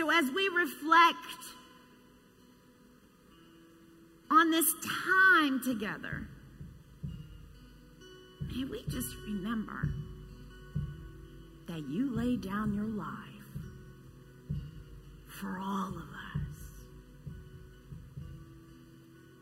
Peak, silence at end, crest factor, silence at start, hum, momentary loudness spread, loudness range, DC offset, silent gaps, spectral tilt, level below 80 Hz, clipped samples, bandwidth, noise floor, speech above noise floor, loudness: -12 dBFS; 0.2 s; 22 dB; 0 s; none; 27 LU; 14 LU; under 0.1%; none; -4 dB/octave; -54 dBFS; under 0.1%; 16 kHz; -60 dBFS; 30 dB; -31 LUFS